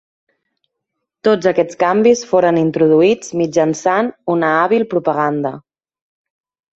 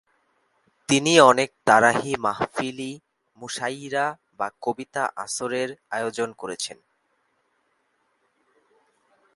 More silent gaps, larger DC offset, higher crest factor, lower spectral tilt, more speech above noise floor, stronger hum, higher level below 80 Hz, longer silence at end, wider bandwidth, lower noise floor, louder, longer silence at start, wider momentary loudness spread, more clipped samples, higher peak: neither; neither; second, 14 dB vs 24 dB; first, -5.5 dB/octave vs -3.5 dB/octave; first, 63 dB vs 47 dB; neither; first, -60 dBFS vs -66 dBFS; second, 1.15 s vs 2.6 s; second, 8.2 kHz vs 11.5 kHz; first, -77 dBFS vs -70 dBFS; first, -15 LUFS vs -23 LUFS; first, 1.25 s vs 0.9 s; second, 6 LU vs 16 LU; neither; about the same, -2 dBFS vs 0 dBFS